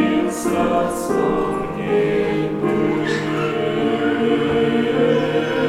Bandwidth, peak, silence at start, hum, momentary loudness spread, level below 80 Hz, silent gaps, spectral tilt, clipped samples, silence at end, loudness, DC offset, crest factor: 15.5 kHz; -6 dBFS; 0 s; none; 3 LU; -46 dBFS; none; -6 dB/octave; under 0.1%; 0 s; -19 LUFS; under 0.1%; 12 dB